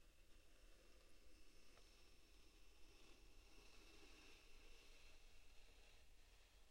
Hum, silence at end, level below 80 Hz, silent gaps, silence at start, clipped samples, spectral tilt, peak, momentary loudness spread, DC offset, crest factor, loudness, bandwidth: none; 0 s; -70 dBFS; none; 0 s; under 0.1%; -2.5 dB/octave; -52 dBFS; 3 LU; under 0.1%; 12 dB; -68 LUFS; 16 kHz